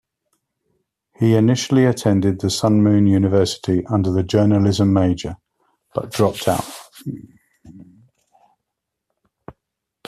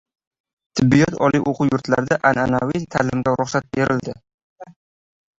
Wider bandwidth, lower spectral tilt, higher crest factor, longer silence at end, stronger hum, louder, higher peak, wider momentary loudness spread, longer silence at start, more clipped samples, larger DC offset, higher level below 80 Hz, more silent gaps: first, 14.5 kHz vs 7.8 kHz; about the same, -6.5 dB/octave vs -6.5 dB/octave; about the same, 16 dB vs 18 dB; second, 0.55 s vs 0.7 s; neither; about the same, -17 LUFS vs -19 LUFS; about the same, -4 dBFS vs -2 dBFS; first, 17 LU vs 7 LU; first, 1.2 s vs 0.75 s; neither; neither; about the same, -52 dBFS vs -48 dBFS; second, none vs 4.34-4.56 s